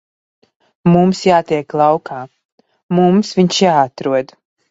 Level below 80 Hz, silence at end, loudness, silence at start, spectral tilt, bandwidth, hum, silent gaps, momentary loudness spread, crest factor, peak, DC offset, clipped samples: -56 dBFS; 0.45 s; -14 LUFS; 0.85 s; -6 dB/octave; 7.8 kHz; none; 2.45-2.58 s, 2.83-2.89 s; 13 LU; 16 dB; 0 dBFS; under 0.1%; under 0.1%